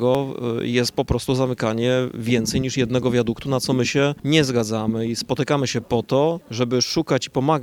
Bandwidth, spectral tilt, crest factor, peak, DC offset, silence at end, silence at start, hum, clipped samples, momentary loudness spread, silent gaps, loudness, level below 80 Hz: 18 kHz; -5 dB/octave; 16 dB; -4 dBFS; under 0.1%; 0 s; 0 s; none; under 0.1%; 4 LU; none; -21 LUFS; -44 dBFS